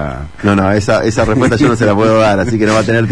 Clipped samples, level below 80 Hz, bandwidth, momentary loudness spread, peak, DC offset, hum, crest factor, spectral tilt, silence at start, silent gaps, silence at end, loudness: under 0.1%; -32 dBFS; 10.5 kHz; 3 LU; 0 dBFS; 2%; none; 10 dB; -6.5 dB/octave; 0 s; none; 0 s; -11 LUFS